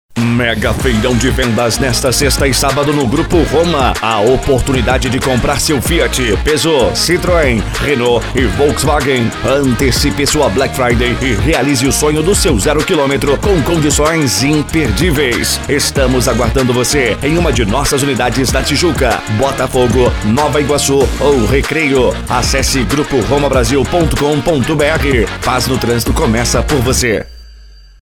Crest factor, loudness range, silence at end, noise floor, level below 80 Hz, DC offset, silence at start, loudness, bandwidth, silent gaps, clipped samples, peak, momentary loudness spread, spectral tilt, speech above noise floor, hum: 12 dB; 1 LU; 0.4 s; -37 dBFS; -22 dBFS; 0.1%; 0.1 s; -12 LUFS; 18.5 kHz; none; under 0.1%; 0 dBFS; 3 LU; -4.5 dB/octave; 25 dB; none